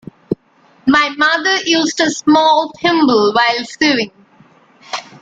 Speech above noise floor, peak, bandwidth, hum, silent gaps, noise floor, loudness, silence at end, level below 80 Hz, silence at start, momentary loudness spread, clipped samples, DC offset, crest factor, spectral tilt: 38 dB; 0 dBFS; 9 kHz; none; none; -51 dBFS; -13 LUFS; 0.2 s; -54 dBFS; 0.3 s; 14 LU; under 0.1%; under 0.1%; 14 dB; -3 dB/octave